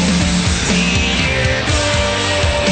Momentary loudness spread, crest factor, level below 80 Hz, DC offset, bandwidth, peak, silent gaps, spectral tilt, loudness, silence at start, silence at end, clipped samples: 1 LU; 12 dB; -24 dBFS; under 0.1%; 9.2 kHz; -2 dBFS; none; -4 dB/octave; -14 LUFS; 0 s; 0 s; under 0.1%